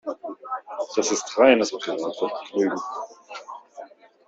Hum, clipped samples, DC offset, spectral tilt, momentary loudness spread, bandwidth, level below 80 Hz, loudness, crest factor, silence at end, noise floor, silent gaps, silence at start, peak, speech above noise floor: none; under 0.1%; under 0.1%; -3 dB/octave; 23 LU; 8 kHz; -70 dBFS; -24 LUFS; 22 dB; 0.4 s; -44 dBFS; none; 0.05 s; -4 dBFS; 22 dB